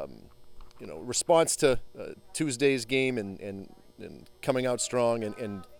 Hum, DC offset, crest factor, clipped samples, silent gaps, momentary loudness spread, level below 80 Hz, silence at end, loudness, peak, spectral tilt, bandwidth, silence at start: none; under 0.1%; 20 dB; under 0.1%; none; 21 LU; -54 dBFS; 0 s; -28 LUFS; -10 dBFS; -3.5 dB/octave; 18 kHz; 0 s